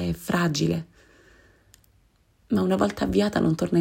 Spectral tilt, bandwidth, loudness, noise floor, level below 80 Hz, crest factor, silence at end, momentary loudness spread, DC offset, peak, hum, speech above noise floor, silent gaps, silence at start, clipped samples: -6 dB/octave; 16 kHz; -24 LUFS; -62 dBFS; -48 dBFS; 18 dB; 0 s; 6 LU; under 0.1%; -8 dBFS; none; 39 dB; none; 0 s; under 0.1%